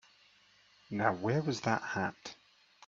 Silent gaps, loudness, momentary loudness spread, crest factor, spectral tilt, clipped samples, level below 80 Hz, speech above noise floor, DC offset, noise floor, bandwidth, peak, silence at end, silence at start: none; -34 LUFS; 13 LU; 24 dB; -5.5 dB/octave; under 0.1%; -74 dBFS; 32 dB; under 0.1%; -65 dBFS; 7.8 kHz; -12 dBFS; 0.55 s; 0.9 s